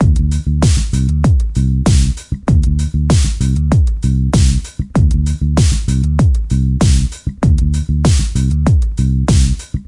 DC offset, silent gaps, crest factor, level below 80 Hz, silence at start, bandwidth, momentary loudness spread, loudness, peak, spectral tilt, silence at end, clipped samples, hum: under 0.1%; none; 12 dB; -16 dBFS; 0 s; 11.5 kHz; 3 LU; -14 LUFS; 0 dBFS; -6.5 dB/octave; 0.05 s; under 0.1%; none